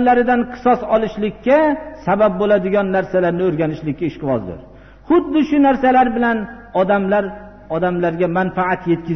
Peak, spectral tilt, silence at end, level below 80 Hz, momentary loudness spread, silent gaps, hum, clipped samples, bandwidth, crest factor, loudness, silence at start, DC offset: -4 dBFS; -6 dB/octave; 0 s; -44 dBFS; 9 LU; none; none; under 0.1%; 6.4 kHz; 12 dB; -17 LUFS; 0 s; 0.2%